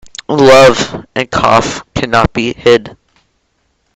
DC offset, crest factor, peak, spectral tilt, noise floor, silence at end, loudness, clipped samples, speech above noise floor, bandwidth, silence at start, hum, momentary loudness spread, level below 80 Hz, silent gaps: under 0.1%; 12 dB; 0 dBFS; -4.5 dB/octave; -61 dBFS; 1.05 s; -10 LUFS; 2%; 51 dB; 14.5 kHz; 0.3 s; none; 13 LU; -34 dBFS; none